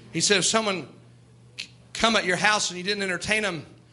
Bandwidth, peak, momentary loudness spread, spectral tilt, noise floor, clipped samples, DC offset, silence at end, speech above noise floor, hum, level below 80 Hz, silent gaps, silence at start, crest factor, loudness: 12 kHz; -6 dBFS; 18 LU; -2 dB/octave; -52 dBFS; under 0.1%; under 0.1%; 0.2 s; 28 dB; none; -58 dBFS; none; 0 s; 20 dB; -23 LUFS